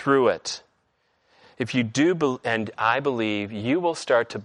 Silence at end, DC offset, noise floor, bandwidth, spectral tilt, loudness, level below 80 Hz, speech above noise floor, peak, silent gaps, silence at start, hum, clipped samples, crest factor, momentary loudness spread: 0 s; under 0.1%; -69 dBFS; 11 kHz; -5 dB/octave; -24 LUFS; -68 dBFS; 46 dB; -6 dBFS; none; 0 s; none; under 0.1%; 18 dB; 8 LU